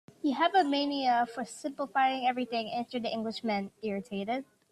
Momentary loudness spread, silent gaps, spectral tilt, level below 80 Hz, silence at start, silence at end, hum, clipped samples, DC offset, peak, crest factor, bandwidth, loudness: 10 LU; none; -4.5 dB/octave; -76 dBFS; 0.25 s; 0.3 s; none; under 0.1%; under 0.1%; -14 dBFS; 16 dB; 12.5 kHz; -31 LUFS